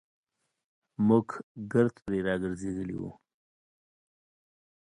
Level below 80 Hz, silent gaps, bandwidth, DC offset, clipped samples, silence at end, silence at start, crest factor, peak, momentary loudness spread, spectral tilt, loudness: -60 dBFS; 1.43-1.55 s; 10.5 kHz; under 0.1%; under 0.1%; 1.75 s; 1 s; 22 dB; -12 dBFS; 15 LU; -8 dB/octave; -29 LUFS